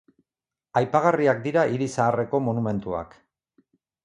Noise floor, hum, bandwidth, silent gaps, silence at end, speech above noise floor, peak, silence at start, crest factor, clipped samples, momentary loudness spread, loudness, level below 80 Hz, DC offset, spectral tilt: under -90 dBFS; none; 11.5 kHz; none; 1 s; over 67 dB; -4 dBFS; 0.75 s; 20 dB; under 0.1%; 10 LU; -24 LUFS; -58 dBFS; under 0.1%; -7 dB/octave